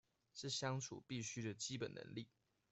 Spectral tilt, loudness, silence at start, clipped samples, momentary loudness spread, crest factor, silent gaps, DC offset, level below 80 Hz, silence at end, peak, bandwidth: -4 dB/octave; -47 LUFS; 0.35 s; under 0.1%; 11 LU; 18 dB; none; under 0.1%; -80 dBFS; 0.45 s; -30 dBFS; 8.2 kHz